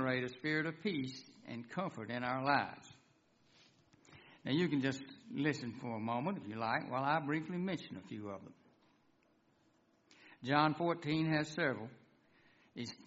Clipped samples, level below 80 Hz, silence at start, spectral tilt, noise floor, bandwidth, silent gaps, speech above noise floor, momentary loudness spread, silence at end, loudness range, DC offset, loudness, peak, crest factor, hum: under 0.1%; -76 dBFS; 0 s; -4.5 dB/octave; -73 dBFS; 7.6 kHz; none; 35 dB; 14 LU; 0.05 s; 4 LU; under 0.1%; -38 LUFS; -16 dBFS; 24 dB; none